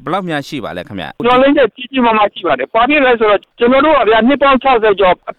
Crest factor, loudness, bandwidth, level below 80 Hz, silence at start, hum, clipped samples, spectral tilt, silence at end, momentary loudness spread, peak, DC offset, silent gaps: 10 dB; -11 LUFS; 9.8 kHz; -40 dBFS; 0.05 s; none; under 0.1%; -6 dB/octave; 0.05 s; 11 LU; -2 dBFS; under 0.1%; none